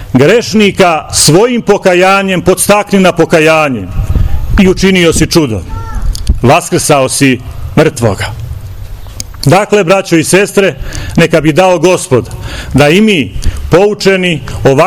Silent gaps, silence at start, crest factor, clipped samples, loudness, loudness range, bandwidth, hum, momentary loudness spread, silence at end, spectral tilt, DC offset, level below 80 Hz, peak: none; 0 s; 8 dB; 6%; -8 LUFS; 4 LU; over 20 kHz; none; 13 LU; 0 s; -4.5 dB/octave; under 0.1%; -20 dBFS; 0 dBFS